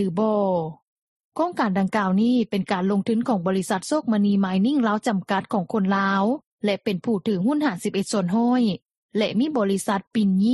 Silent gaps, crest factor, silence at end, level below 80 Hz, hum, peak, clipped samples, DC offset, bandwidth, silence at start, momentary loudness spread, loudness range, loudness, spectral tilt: 0.82-1.32 s, 6.46-6.58 s, 8.82-8.86 s, 8.96-9.09 s; 16 dB; 0 s; -64 dBFS; none; -6 dBFS; under 0.1%; under 0.1%; 12 kHz; 0 s; 5 LU; 1 LU; -23 LUFS; -6 dB/octave